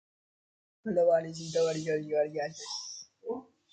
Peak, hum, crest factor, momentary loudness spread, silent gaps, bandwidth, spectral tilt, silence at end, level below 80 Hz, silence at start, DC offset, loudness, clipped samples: -16 dBFS; none; 16 dB; 15 LU; none; 9.2 kHz; -4.5 dB/octave; 0.3 s; -76 dBFS; 0.85 s; under 0.1%; -31 LUFS; under 0.1%